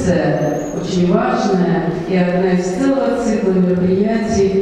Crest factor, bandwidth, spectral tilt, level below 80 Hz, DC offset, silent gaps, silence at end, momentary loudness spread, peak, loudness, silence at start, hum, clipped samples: 14 dB; 9.8 kHz; -7 dB/octave; -40 dBFS; under 0.1%; none; 0 s; 4 LU; 0 dBFS; -16 LUFS; 0 s; none; under 0.1%